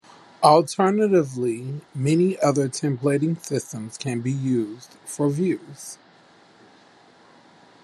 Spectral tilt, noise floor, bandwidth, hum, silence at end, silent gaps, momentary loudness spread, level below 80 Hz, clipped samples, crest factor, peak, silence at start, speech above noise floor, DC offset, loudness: -6 dB/octave; -53 dBFS; 13 kHz; none; 1.9 s; none; 17 LU; -68 dBFS; under 0.1%; 22 dB; -2 dBFS; 0.4 s; 31 dB; under 0.1%; -22 LUFS